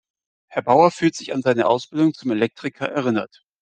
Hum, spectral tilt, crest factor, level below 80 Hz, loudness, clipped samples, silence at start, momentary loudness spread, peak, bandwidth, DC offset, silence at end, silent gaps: none; -6 dB/octave; 18 dB; -66 dBFS; -20 LUFS; under 0.1%; 0.5 s; 11 LU; -2 dBFS; 9.2 kHz; under 0.1%; 0.35 s; none